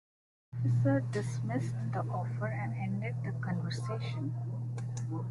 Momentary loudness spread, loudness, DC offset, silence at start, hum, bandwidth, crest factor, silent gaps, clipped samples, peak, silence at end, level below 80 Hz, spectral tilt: 8 LU; -35 LUFS; under 0.1%; 0.55 s; none; 11 kHz; 16 dB; none; under 0.1%; -18 dBFS; 0 s; -64 dBFS; -7.5 dB/octave